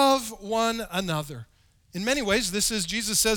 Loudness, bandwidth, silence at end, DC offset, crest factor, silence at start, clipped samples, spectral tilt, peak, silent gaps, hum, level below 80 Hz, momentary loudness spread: -25 LUFS; over 20 kHz; 0 s; under 0.1%; 18 dB; 0 s; under 0.1%; -2.5 dB/octave; -8 dBFS; none; none; -48 dBFS; 11 LU